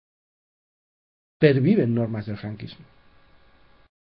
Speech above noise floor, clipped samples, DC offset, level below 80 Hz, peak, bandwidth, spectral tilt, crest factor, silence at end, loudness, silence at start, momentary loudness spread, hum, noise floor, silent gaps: 33 dB; under 0.1%; under 0.1%; -60 dBFS; -2 dBFS; 5.4 kHz; -11 dB/octave; 24 dB; 1.3 s; -22 LUFS; 1.4 s; 18 LU; none; -55 dBFS; none